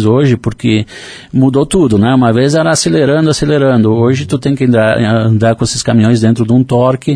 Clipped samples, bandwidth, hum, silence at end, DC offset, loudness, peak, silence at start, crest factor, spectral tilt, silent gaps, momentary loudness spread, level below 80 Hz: under 0.1%; 10.5 kHz; none; 0 s; under 0.1%; -10 LUFS; 0 dBFS; 0 s; 10 dB; -6 dB/octave; none; 4 LU; -38 dBFS